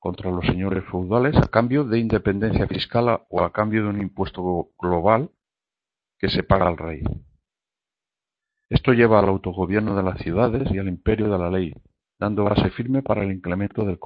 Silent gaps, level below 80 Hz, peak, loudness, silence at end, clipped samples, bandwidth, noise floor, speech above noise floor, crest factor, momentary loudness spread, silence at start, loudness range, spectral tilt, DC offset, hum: none; -40 dBFS; 0 dBFS; -22 LUFS; 0 s; under 0.1%; 5.8 kHz; -90 dBFS; 69 dB; 22 dB; 8 LU; 0.05 s; 3 LU; -9.5 dB/octave; under 0.1%; none